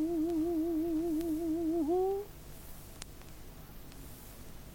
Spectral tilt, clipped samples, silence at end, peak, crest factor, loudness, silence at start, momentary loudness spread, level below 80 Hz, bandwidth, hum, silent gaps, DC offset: -6.5 dB/octave; under 0.1%; 0 s; -16 dBFS; 18 dB; -33 LUFS; 0 s; 19 LU; -52 dBFS; 17 kHz; 50 Hz at -55 dBFS; none; under 0.1%